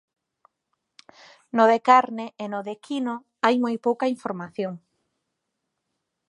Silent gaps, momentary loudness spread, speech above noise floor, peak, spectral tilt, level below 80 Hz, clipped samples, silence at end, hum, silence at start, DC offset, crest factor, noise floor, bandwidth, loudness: none; 14 LU; 57 dB; -4 dBFS; -5.5 dB/octave; -80 dBFS; under 0.1%; 1.5 s; none; 1.55 s; under 0.1%; 22 dB; -80 dBFS; 11 kHz; -23 LUFS